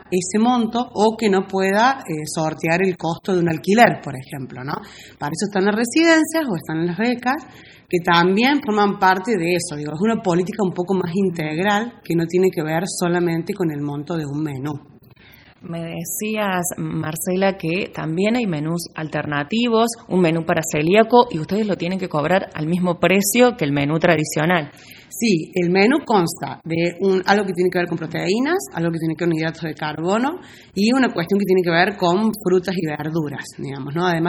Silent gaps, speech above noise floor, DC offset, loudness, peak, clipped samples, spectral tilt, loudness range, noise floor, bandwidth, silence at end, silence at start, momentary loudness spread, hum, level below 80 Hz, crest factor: none; 28 dB; under 0.1%; -19 LUFS; 0 dBFS; under 0.1%; -5 dB/octave; 4 LU; -48 dBFS; over 20 kHz; 0 s; 0.1 s; 10 LU; none; -56 dBFS; 20 dB